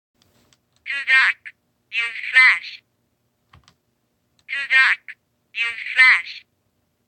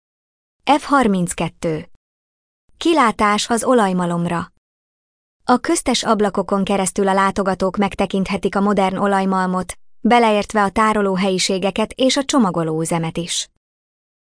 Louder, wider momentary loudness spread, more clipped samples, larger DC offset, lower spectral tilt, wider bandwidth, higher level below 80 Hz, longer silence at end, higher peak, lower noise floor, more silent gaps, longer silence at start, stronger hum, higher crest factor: about the same, -16 LUFS vs -18 LUFS; first, 20 LU vs 8 LU; neither; neither; second, 2 dB/octave vs -4.5 dB/octave; about the same, 9.6 kHz vs 10.5 kHz; second, -72 dBFS vs -46 dBFS; about the same, 0.7 s vs 0.8 s; about the same, -2 dBFS vs -4 dBFS; second, -69 dBFS vs under -90 dBFS; second, none vs 1.96-2.68 s, 4.58-5.40 s; first, 0.85 s vs 0.65 s; neither; about the same, 18 dB vs 16 dB